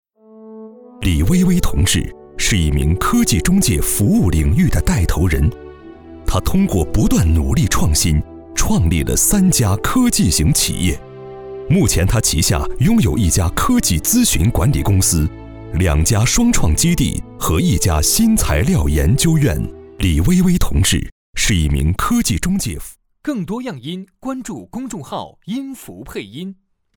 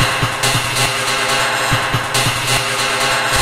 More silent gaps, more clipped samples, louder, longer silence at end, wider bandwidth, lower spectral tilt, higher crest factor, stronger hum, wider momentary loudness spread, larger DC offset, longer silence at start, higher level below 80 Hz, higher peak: first, 21.12-21.33 s vs none; neither; about the same, -16 LUFS vs -15 LUFS; first, 0.45 s vs 0 s; first, over 20 kHz vs 16 kHz; first, -4.5 dB/octave vs -2 dB/octave; about the same, 12 dB vs 14 dB; neither; first, 14 LU vs 1 LU; neither; first, 0.35 s vs 0 s; first, -24 dBFS vs -38 dBFS; about the same, -4 dBFS vs -2 dBFS